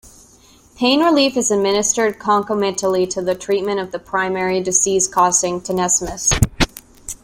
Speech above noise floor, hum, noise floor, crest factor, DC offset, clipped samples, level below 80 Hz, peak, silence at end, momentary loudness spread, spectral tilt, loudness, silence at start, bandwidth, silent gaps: 32 dB; none; -49 dBFS; 18 dB; under 0.1%; under 0.1%; -36 dBFS; 0 dBFS; 0.1 s; 7 LU; -3 dB/octave; -17 LUFS; 0.05 s; 16.5 kHz; none